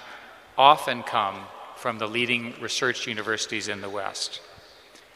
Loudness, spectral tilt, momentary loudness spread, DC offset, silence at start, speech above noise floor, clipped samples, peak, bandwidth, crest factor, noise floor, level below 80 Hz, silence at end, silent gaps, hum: -25 LUFS; -2.5 dB/octave; 19 LU; under 0.1%; 0 s; 26 dB; under 0.1%; -2 dBFS; 15.5 kHz; 26 dB; -51 dBFS; -70 dBFS; 0.55 s; none; none